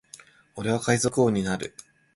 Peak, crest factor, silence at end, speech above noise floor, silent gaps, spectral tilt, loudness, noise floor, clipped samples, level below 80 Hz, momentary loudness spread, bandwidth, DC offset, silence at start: -6 dBFS; 20 dB; 0.45 s; 27 dB; none; -5 dB/octave; -25 LUFS; -51 dBFS; under 0.1%; -56 dBFS; 14 LU; 11.5 kHz; under 0.1%; 0.55 s